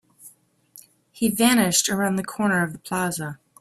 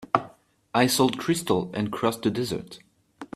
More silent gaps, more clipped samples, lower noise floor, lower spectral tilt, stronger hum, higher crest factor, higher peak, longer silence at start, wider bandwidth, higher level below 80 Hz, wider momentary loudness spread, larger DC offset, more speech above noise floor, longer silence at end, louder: neither; neither; about the same, -53 dBFS vs -52 dBFS; about the same, -3.5 dB/octave vs -4.5 dB/octave; neither; about the same, 20 dB vs 24 dB; about the same, -4 dBFS vs -2 dBFS; first, 0.25 s vs 0 s; about the same, 16 kHz vs 15.5 kHz; about the same, -60 dBFS vs -62 dBFS; about the same, 9 LU vs 11 LU; neither; first, 31 dB vs 27 dB; first, 0.25 s vs 0.1 s; first, -22 LUFS vs -25 LUFS